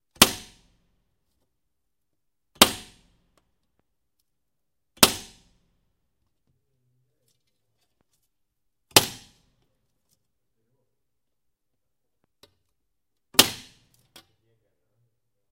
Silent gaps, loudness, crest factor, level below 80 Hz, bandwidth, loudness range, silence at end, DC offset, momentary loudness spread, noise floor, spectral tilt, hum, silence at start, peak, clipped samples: none; -19 LUFS; 30 dB; -56 dBFS; 16 kHz; 3 LU; 1.95 s; under 0.1%; 19 LU; -84 dBFS; -1 dB/octave; none; 0.2 s; 0 dBFS; under 0.1%